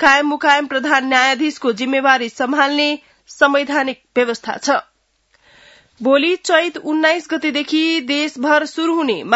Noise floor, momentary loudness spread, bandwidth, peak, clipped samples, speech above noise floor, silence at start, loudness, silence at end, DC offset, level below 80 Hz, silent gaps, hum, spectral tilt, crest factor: -61 dBFS; 6 LU; 8 kHz; 0 dBFS; under 0.1%; 45 dB; 0 s; -16 LUFS; 0 s; under 0.1%; -62 dBFS; none; none; -2.5 dB/octave; 16 dB